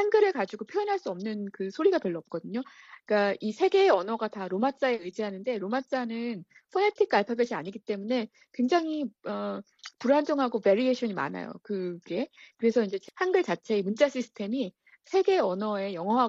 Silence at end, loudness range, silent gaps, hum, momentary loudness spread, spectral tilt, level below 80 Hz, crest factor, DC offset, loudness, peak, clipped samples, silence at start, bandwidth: 0 s; 2 LU; none; none; 11 LU; -6 dB/octave; -76 dBFS; 18 dB; under 0.1%; -29 LUFS; -10 dBFS; under 0.1%; 0 s; 7.8 kHz